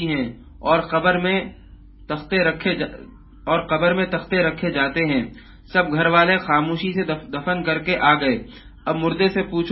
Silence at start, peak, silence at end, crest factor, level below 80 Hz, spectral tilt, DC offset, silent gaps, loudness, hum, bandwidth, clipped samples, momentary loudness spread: 0 s; -2 dBFS; 0 s; 20 dB; -46 dBFS; -10.5 dB/octave; under 0.1%; none; -20 LUFS; none; 5.8 kHz; under 0.1%; 11 LU